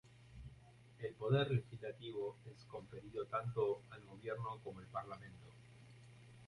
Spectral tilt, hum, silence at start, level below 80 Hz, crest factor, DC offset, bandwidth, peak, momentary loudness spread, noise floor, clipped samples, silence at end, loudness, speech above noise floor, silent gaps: -7.5 dB/octave; none; 0.05 s; -70 dBFS; 20 dB; under 0.1%; 11 kHz; -24 dBFS; 23 LU; -63 dBFS; under 0.1%; 0 s; -43 LUFS; 20 dB; none